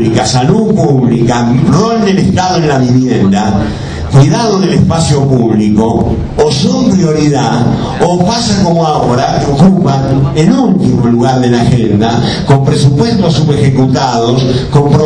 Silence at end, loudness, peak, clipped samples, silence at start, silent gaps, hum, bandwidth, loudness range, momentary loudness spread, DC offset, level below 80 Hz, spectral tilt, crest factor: 0 s; -9 LUFS; 0 dBFS; 2%; 0 s; none; none; 10 kHz; 1 LU; 3 LU; under 0.1%; -28 dBFS; -6.5 dB/octave; 8 dB